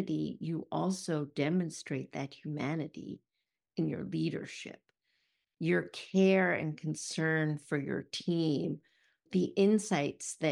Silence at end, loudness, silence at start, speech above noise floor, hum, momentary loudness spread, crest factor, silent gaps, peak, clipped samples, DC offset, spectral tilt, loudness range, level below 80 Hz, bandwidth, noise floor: 0 s; -33 LUFS; 0 s; 54 dB; none; 13 LU; 18 dB; none; -16 dBFS; under 0.1%; under 0.1%; -5.5 dB/octave; 7 LU; -76 dBFS; 12 kHz; -87 dBFS